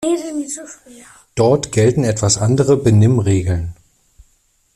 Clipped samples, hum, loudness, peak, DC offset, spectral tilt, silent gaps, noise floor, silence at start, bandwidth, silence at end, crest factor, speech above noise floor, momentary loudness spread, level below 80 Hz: under 0.1%; none; -15 LUFS; -2 dBFS; under 0.1%; -6 dB/octave; none; -59 dBFS; 0 s; 12 kHz; 1.05 s; 16 dB; 44 dB; 15 LU; -42 dBFS